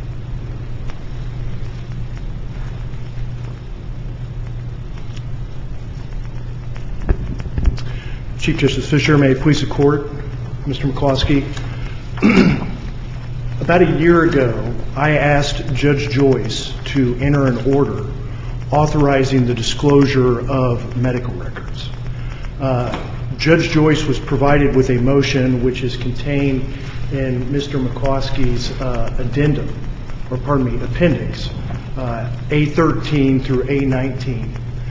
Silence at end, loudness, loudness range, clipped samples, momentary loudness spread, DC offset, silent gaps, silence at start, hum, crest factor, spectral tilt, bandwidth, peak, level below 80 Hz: 0 s; -18 LUFS; 13 LU; under 0.1%; 16 LU; under 0.1%; none; 0 s; none; 16 dB; -7 dB/octave; 7.8 kHz; 0 dBFS; -28 dBFS